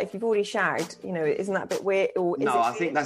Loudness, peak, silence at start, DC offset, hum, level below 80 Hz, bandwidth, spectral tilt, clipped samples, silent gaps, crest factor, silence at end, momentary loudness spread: -26 LUFS; -10 dBFS; 0 s; under 0.1%; none; -72 dBFS; 15 kHz; -5 dB/octave; under 0.1%; none; 16 dB; 0 s; 4 LU